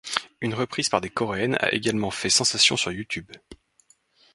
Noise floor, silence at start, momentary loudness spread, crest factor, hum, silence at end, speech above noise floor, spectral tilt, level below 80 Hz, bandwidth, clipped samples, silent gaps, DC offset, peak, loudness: -62 dBFS; 0.05 s; 12 LU; 26 dB; none; 0.8 s; 37 dB; -2.5 dB/octave; -56 dBFS; 11.5 kHz; under 0.1%; none; under 0.1%; 0 dBFS; -23 LUFS